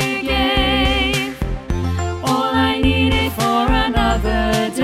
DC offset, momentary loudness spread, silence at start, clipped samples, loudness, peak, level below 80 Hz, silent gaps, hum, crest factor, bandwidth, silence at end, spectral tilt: under 0.1%; 6 LU; 0 s; under 0.1%; -17 LUFS; -2 dBFS; -24 dBFS; none; none; 14 dB; 16.5 kHz; 0 s; -5 dB/octave